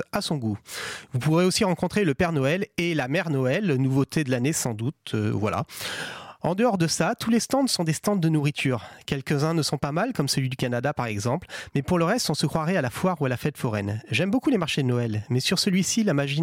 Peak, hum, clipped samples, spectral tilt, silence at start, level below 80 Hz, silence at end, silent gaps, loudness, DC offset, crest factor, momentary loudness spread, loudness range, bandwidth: -10 dBFS; none; under 0.1%; -5 dB/octave; 0 s; -56 dBFS; 0 s; none; -25 LUFS; under 0.1%; 14 dB; 8 LU; 2 LU; 16.5 kHz